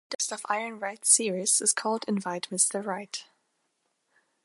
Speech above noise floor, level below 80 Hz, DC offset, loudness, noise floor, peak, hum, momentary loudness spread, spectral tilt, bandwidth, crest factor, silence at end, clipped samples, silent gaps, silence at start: 48 dB; -84 dBFS; under 0.1%; -26 LUFS; -76 dBFS; -6 dBFS; none; 13 LU; -1.5 dB/octave; 12 kHz; 24 dB; 1.2 s; under 0.1%; 0.15-0.19 s; 0.1 s